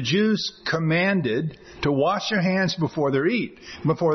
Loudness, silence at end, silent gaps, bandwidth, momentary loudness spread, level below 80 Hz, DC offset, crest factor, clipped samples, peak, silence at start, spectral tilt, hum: -23 LUFS; 0 s; none; 6.4 kHz; 7 LU; -54 dBFS; under 0.1%; 12 dB; under 0.1%; -10 dBFS; 0 s; -6 dB/octave; none